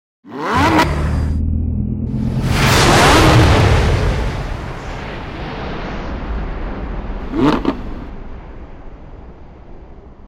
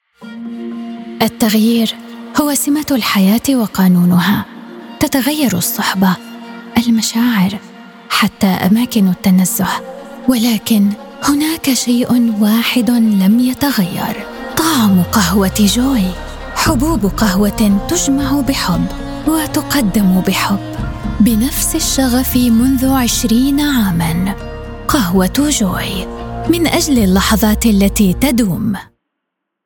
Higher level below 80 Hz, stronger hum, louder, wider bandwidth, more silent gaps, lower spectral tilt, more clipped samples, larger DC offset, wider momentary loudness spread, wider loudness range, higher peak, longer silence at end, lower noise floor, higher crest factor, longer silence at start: first, -24 dBFS vs -30 dBFS; neither; second, -16 LUFS vs -13 LUFS; about the same, 16.5 kHz vs 18 kHz; neither; about the same, -5 dB/octave vs -4.5 dB/octave; neither; neither; first, 20 LU vs 11 LU; first, 10 LU vs 2 LU; about the same, -2 dBFS vs 0 dBFS; second, 0 s vs 0.8 s; second, -36 dBFS vs -75 dBFS; about the same, 14 dB vs 14 dB; about the same, 0.25 s vs 0.2 s